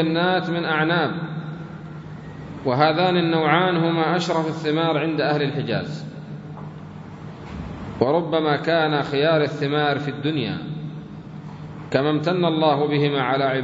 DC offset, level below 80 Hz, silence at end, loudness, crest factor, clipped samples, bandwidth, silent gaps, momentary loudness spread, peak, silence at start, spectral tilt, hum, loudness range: under 0.1%; -54 dBFS; 0 s; -21 LUFS; 20 dB; under 0.1%; 7.8 kHz; none; 17 LU; -2 dBFS; 0 s; -7 dB/octave; none; 5 LU